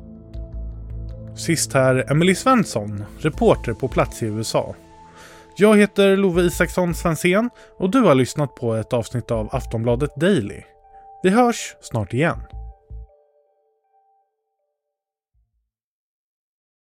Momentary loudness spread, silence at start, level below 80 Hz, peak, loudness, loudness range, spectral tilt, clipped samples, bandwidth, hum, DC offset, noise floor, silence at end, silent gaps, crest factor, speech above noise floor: 19 LU; 0 s; -38 dBFS; -2 dBFS; -19 LUFS; 6 LU; -5.5 dB/octave; under 0.1%; 16.5 kHz; none; under 0.1%; -83 dBFS; 3.75 s; none; 20 dB; 65 dB